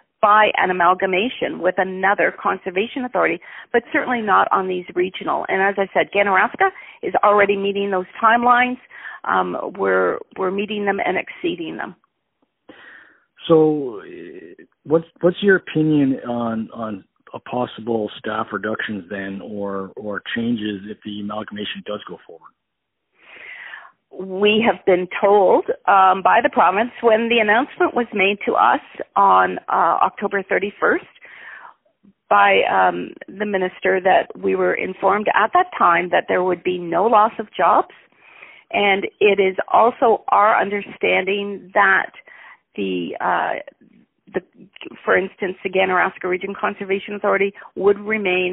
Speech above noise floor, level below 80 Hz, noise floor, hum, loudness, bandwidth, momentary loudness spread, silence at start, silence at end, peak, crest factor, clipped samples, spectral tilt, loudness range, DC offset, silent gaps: 59 dB; -62 dBFS; -77 dBFS; none; -18 LUFS; 4 kHz; 15 LU; 0.25 s; 0 s; 0 dBFS; 18 dB; under 0.1%; -2.5 dB/octave; 9 LU; under 0.1%; none